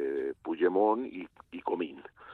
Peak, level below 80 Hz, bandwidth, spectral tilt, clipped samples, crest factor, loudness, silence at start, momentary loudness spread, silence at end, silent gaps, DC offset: -14 dBFS; -72 dBFS; 4.3 kHz; -8 dB/octave; under 0.1%; 18 dB; -31 LUFS; 0 s; 18 LU; 0 s; none; under 0.1%